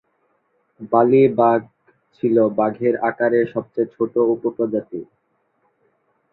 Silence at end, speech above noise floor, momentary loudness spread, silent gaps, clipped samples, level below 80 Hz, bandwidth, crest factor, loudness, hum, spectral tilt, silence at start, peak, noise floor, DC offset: 1.3 s; 49 dB; 11 LU; none; under 0.1%; -64 dBFS; 4.2 kHz; 18 dB; -19 LUFS; none; -11 dB/octave; 0.8 s; -2 dBFS; -67 dBFS; under 0.1%